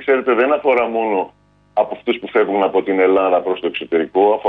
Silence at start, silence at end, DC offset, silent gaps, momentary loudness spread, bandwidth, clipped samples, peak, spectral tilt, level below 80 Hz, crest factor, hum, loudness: 0 s; 0 s; under 0.1%; none; 7 LU; 4.2 kHz; under 0.1%; -4 dBFS; -7.5 dB/octave; -60 dBFS; 14 dB; 50 Hz at -55 dBFS; -17 LUFS